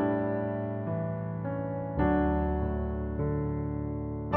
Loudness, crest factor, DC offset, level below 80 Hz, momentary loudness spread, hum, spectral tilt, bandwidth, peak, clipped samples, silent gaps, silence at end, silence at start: -31 LUFS; 18 dB; under 0.1%; -38 dBFS; 7 LU; none; -9 dB/octave; 3.5 kHz; -12 dBFS; under 0.1%; none; 0 s; 0 s